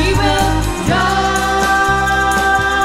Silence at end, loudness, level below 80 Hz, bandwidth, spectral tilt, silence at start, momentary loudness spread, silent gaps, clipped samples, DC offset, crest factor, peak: 0 s; -14 LUFS; -24 dBFS; 16.5 kHz; -4 dB/octave; 0 s; 3 LU; none; under 0.1%; under 0.1%; 12 dB; -2 dBFS